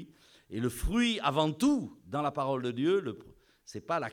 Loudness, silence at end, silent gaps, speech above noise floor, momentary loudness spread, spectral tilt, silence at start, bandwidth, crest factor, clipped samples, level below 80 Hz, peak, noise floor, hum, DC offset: -31 LUFS; 0 s; none; 24 dB; 14 LU; -5.5 dB/octave; 0 s; 17.5 kHz; 18 dB; under 0.1%; -46 dBFS; -12 dBFS; -54 dBFS; none; under 0.1%